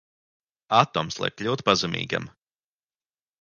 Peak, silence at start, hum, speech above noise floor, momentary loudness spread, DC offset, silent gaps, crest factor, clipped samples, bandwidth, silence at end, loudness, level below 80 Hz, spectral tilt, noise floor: -2 dBFS; 0.7 s; none; over 66 dB; 9 LU; under 0.1%; none; 26 dB; under 0.1%; 10 kHz; 1.15 s; -24 LUFS; -60 dBFS; -4 dB/octave; under -90 dBFS